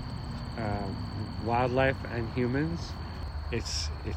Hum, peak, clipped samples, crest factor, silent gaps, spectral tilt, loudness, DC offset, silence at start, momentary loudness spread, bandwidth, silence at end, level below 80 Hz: none; -14 dBFS; under 0.1%; 18 dB; none; -5.5 dB/octave; -32 LUFS; under 0.1%; 0 s; 11 LU; 14.5 kHz; 0 s; -42 dBFS